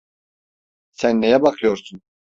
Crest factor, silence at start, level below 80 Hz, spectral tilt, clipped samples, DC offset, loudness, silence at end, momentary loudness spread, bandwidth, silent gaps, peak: 18 dB; 1 s; -58 dBFS; -5.5 dB/octave; under 0.1%; under 0.1%; -18 LUFS; 0.4 s; 7 LU; 7.8 kHz; none; -2 dBFS